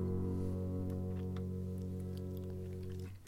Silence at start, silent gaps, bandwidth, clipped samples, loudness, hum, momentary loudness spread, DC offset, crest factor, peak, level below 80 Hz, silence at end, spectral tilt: 0 s; none; 16 kHz; under 0.1%; -42 LUFS; none; 6 LU; under 0.1%; 14 dB; -26 dBFS; -56 dBFS; 0 s; -9 dB/octave